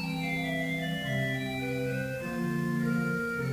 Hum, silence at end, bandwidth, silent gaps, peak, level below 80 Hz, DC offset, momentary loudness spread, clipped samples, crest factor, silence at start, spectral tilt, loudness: none; 0 s; 16 kHz; none; -18 dBFS; -56 dBFS; under 0.1%; 3 LU; under 0.1%; 12 dB; 0 s; -6 dB/octave; -31 LUFS